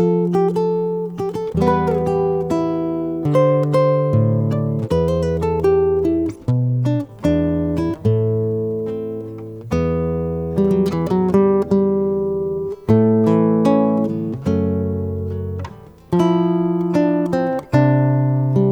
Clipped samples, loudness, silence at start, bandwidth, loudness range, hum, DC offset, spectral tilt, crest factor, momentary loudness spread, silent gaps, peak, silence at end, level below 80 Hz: under 0.1%; -18 LUFS; 0 s; 11.5 kHz; 4 LU; none; under 0.1%; -9.5 dB/octave; 16 dB; 8 LU; none; -2 dBFS; 0 s; -40 dBFS